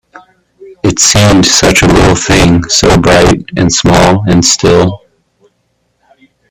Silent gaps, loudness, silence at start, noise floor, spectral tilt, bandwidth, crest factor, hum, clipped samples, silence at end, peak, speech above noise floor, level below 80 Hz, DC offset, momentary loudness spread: none; -7 LUFS; 0.15 s; -59 dBFS; -4 dB/octave; over 20 kHz; 8 dB; none; 0.3%; 1.55 s; 0 dBFS; 53 dB; -24 dBFS; under 0.1%; 5 LU